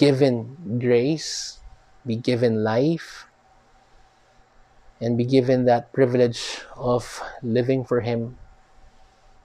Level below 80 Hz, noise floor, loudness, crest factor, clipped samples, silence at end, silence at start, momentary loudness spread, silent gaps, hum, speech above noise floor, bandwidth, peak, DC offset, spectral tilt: -54 dBFS; -57 dBFS; -22 LUFS; 20 dB; under 0.1%; 1.1 s; 0 s; 12 LU; none; none; 35 dB; 12.5 kHz; -4 dBFS; under 0.1%; -6 dB/octave